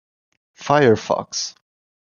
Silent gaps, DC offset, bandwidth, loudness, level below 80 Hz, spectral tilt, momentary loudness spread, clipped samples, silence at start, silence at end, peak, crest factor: none; under 0.1%; 7.2 kHz; -19 LUFS; -60 dBFS; -4.5 dB/octave; 14 LU; under 0.1%; 0.6 s; 0.65 s; -2 dBFS; 20 dB